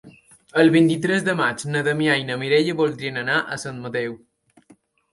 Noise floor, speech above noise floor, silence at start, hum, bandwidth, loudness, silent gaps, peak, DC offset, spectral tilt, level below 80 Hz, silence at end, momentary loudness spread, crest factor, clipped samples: -56 dBFS; 35 dB; 0.05 s; none; 11.5 kHz; -21 LUFS; none; -4 dBFS; under 0.1%; -5.5 dB/octave; -62 dBFS; 0.95 s; 11 LU; 18 dB; under 0.1%